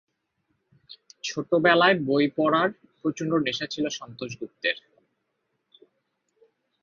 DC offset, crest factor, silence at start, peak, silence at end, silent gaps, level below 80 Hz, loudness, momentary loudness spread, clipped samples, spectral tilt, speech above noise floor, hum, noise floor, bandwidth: under 0.1%; 24 dB; 0.9 s; -4 dBFS; 2.05 s; none; -70 dBFS; -25 LUFS; 16 LU; under 0.1%; -4.5 dB/octave; 53 dB; none; -77 dBFS; 7.4 kHz